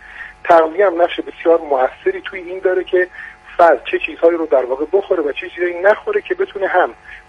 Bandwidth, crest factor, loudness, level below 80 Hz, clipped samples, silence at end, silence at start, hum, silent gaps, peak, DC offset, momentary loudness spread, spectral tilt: 7.4 kHz; 16 dB; -16 LUFS; -52 dBFS; under 0.1%; 0.1 s; 0.1 s; none; none; 0 dBFS; under 0.1%; 10 LU; -5.5 dB/octave